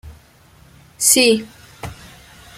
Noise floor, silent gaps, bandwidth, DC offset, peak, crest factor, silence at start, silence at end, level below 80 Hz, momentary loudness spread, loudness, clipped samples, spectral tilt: -49 dBFS; none; 16.5 kHz; under 0.1%; 0 dBFS; 22 dB; 0.05 s; 0.65 s; -48 dBFS; 23 LU; -14 LUFS; under 0.1%; -1.5 dB/octave